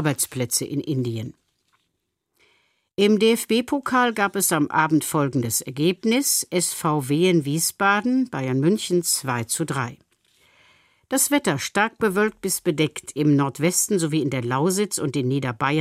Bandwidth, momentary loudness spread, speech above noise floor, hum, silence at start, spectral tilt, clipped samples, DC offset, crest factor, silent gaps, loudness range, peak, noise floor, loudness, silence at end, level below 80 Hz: 16 kHz; 6 LU; 55 dB; none; 0 s; -4 dB/octave; under 0.1%; under 0.1%; 18 dB; none; 3 LU; -6 dBFS; -76 dBFS; -22 LUFS; 0 s; -64 dBFS